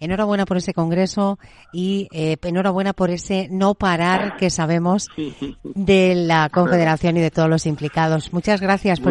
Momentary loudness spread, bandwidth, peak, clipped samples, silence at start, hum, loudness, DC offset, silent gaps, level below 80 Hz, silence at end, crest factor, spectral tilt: 7 LU; 11 kHz; -2 dBFS; under 0.1%; 0 s; none; -19 LUFS; under 0.1%; none; -44 dBFS; 0 s; 16 dB; -6 dB/octave